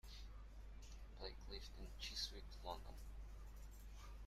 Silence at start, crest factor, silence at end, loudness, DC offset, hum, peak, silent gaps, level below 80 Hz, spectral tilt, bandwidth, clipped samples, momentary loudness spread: 0.05 s; 20 dB; 0 s; -54 LUFS; under 0.1%; none; -34 dBFS; none; -56 dBFS; -3 dB/octave; 15.5 kHz; under 0.1%; 12 LU